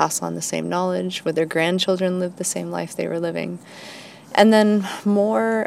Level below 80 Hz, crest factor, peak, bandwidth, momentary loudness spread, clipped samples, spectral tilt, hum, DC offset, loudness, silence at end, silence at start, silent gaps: -70 dBFS; 20 dB; 0 dBFS; 16 kHz; 15 LU; under 0.1%; -4.5 dB/octave; none; under 0.1%; -21 LUFS; 0 s; 0 s; none